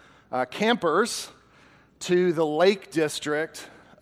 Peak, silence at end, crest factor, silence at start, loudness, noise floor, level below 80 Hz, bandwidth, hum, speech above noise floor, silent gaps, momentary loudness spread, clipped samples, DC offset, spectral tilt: -8 dBFS; 0.35 s; 18 dB; 0.3 s; -25 LUFS; -56 dBFS; -68 dBFS; 15.5 kHz; none; 32 dB; none; 12 LU; under 0.1%; under 0.1%; -4.5 dB/octave